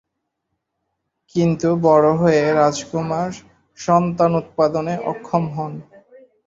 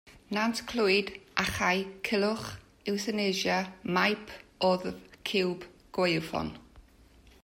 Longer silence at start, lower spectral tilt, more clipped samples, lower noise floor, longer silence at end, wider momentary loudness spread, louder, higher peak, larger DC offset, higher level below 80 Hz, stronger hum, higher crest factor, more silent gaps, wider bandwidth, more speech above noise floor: first, 1.35 s vs 0.05 s; first, -7 dB/octave vs -4.5 dB/octave; neither; first, -76 dBFS vs -58 dBFS; about the same, 0.65 s vs 0.65 s; about the same, 14 LU vs 12 LU; first, -18 LUFS vs -30 LUFS; first, -2 dBFS vs -10 dBFS; neither; about the same, -56 dBFS vs -58 dBFS; neither; about the same, 18 dB vs 22 dB; neither; second, 7.8 kHz vs 16 kHz; first, 58 dB vs 28 dB